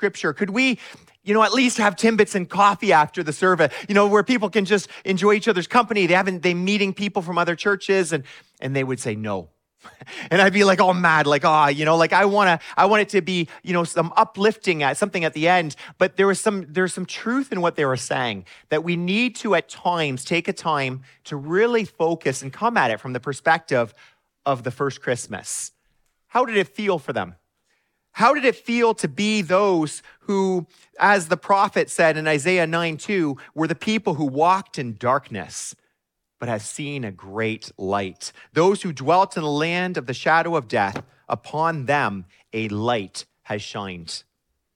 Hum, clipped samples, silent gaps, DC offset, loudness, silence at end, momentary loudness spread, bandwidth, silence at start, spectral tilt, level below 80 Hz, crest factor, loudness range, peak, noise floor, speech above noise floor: none; under 0.1%; none; under 0.1%; -21 LUFS; 0.55 s; 13 LU; 15 kHz; 0 s; -4.5 dB/octave; -68 dBFS; 20 dB; 7 LU; -2 dBFS; -77 dBFS; 56 dB